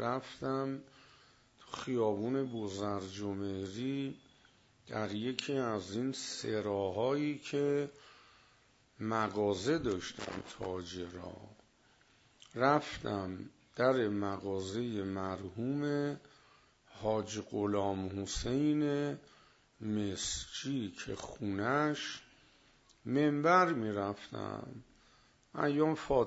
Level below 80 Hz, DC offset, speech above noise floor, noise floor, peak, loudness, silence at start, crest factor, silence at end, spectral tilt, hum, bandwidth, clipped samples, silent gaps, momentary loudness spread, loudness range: -62 dBFS; under 0.1%; 33 dB; -68 dBFS; -14 dBFS; -36 LUFS; 0 s; 24 dB; 0 s; -5 dB/octave; none; 7.6 kHz; under 0.1%; none; 13 LU; 5 LU